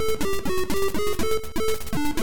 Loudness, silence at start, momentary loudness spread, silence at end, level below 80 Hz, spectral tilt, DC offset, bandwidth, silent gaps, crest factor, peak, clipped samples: -27 LUFS; 0 s; 2 LU; 0 s; -38 dBFS; -4 dB/octave; 7%; 17.5 kHz; none; 10 dB; -12 dBFS; under 0.1%